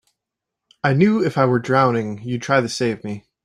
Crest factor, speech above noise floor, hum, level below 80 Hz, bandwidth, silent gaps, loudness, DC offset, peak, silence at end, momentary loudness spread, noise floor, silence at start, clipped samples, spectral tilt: 18 dB; 65 dB; none; -60 dBFS; 12 kHz; none; -19 LUFS; under 0.1%; -2 dBFS; 0.25 s; 10 LU; -83 dBFS; 0.85 s; under 0.1%; -6.5 dB/octave